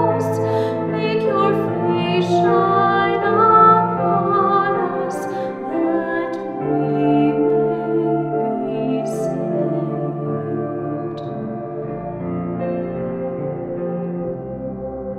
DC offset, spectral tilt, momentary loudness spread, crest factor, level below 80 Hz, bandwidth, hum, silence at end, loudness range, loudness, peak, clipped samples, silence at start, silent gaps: under 0.1%; -7.5 dB/octave; 11 LU; 18 dB; -54 dBFS; 13 kHz; none; 0 s; 10 LU; -19 LUFS; -2 dBFS; under 0.1%; 0 s; none